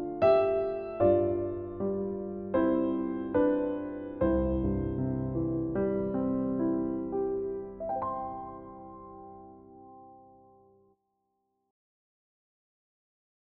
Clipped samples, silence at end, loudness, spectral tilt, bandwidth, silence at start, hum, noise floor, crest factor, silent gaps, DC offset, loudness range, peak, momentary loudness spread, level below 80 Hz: under 0.1%; 3.4 s; -30 LUFS; -8.5 dB/octave; 5 kHz; 0 s; none; -79 dBFS; 18 dB; none; under 0.1%; 12 LU; -14 dBFS; 17 LU; -48 dBFS